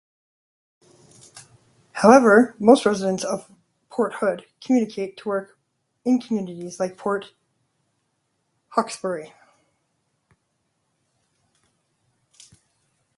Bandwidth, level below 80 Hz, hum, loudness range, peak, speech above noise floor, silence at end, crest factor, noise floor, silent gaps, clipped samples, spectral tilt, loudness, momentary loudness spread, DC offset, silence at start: 11.5 kHz; -70 dBFS; none; 14 LU; 0 dBFS; 53 dB; 3.9 s; 24 dB; -73 dBFS; none; under 0.1%; -5.5 dB/octave; -21 LUFS; 16 LU; under 0.1%; 1.35 s